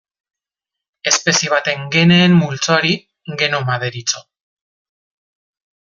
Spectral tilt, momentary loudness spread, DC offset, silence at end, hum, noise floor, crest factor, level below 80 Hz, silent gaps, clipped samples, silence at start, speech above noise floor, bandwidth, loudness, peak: -4 dB/octave; 11 LU; under 0.1%; 1.7 s; none; -85 dBFS; 18 dB; -56 dBFS; none; under 0.1%; 1.05 s; 70 dB; 7.6 kHz; -15 LUFS; 0 dBFS